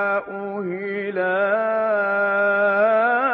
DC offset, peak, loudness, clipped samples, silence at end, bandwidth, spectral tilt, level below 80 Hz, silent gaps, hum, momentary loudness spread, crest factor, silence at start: under 0.1%; -8 dBFS; -20 LUFS; under 0.1%; 0 s; 5.4 kHz; -10 dB/octave; -74 dBFS; none; none; 10 LU; 12 dB; 0 s